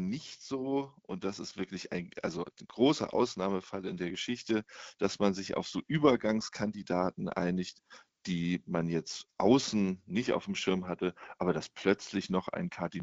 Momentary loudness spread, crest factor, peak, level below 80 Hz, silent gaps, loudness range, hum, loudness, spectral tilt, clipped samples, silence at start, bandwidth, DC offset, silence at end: 12 LU; 22 dB; -10 dBFS; -66 dBFS; none; 2 LU; none; -33 LUFS; -5.5 dB/octave; under 0.1%; 0 s; 8 kHz; under 0.1%; 0 s